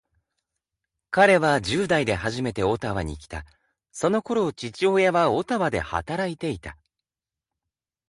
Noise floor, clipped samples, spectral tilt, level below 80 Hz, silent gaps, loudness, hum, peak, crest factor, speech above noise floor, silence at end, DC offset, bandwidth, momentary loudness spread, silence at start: under -90 dBFS; under 0.1%; -5.5 dB/octave; -48 dBFS; none; -23 LUFS; none; -4 dBFS; 20 dB; over 67 dB; 1.35 s; under 0.1%; 11.5 kHz; 15 LU; 1.1 s